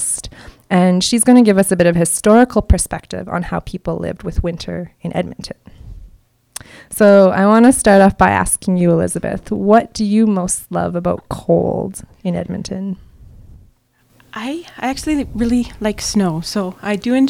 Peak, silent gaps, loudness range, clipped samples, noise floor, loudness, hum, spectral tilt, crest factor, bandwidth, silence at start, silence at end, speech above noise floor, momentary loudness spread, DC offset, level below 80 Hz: 0 dBFS; none; 12 LU; 0.3%; -55 dBFS; -15 LUFS; none; -5 dB/octave; 16 dB; 16 kHz; 0 s; 0 s; 41 dB; 16 LU; under 0.1%; -32 dBFS